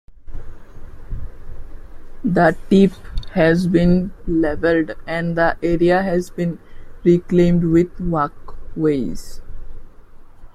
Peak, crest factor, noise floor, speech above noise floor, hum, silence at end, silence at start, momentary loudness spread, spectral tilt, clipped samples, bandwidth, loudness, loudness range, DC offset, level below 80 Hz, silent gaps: -2 dBFS; 16 dB; -38 dBFS; 21 dB; none; 0.05 s; 0.1 s; 20 LU; -8 dB/octave; under 0.1%; 12 kHz; -18 LUFS; 3 LU; under 0.1%; -32 dBFS; none